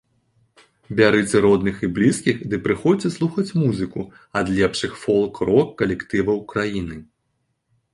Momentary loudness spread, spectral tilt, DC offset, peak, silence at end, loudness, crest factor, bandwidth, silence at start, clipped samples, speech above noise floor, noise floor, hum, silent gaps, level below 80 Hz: 10 LU; -6 dB/octave; under 0.1%; -2 dBFS; 0.9 s; -20 LUFS; 18 dB; 11.5 kHz; 0.9 s; under 0.1%; 52 dB; -72 dBFS; none; none; -48 dBFS